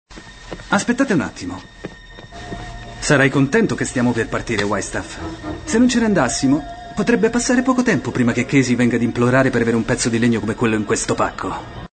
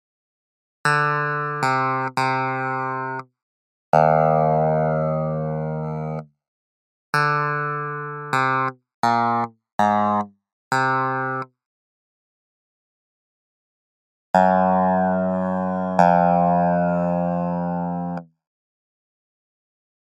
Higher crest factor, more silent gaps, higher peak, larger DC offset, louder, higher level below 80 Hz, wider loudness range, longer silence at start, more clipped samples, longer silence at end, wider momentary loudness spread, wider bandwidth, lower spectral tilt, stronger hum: second, 16 dB vs 22 dB; second, none vs 3.43-3.92 s, 6.48-7.13 s, 8.94-9.03 s, 9.72-9.79 s, 10.52-10.71 s, 11.66-14.34 s; about the same, -2 dBFS vs 0 dBFS; neither; first, -18 LUFS vs -21 LUFS; first, -40 dBFS vs -58 dBFS; second, 3 LU vs 7 LU; second, 0.1 s vs 0.85 s; neither; second, 0.1 s vs 1.8 s; first, 17 LU vs 11 LU; second, 9.2 kHz vs 12.5 kHz; second, -5 dB/octave vs -7 dB/octave; neither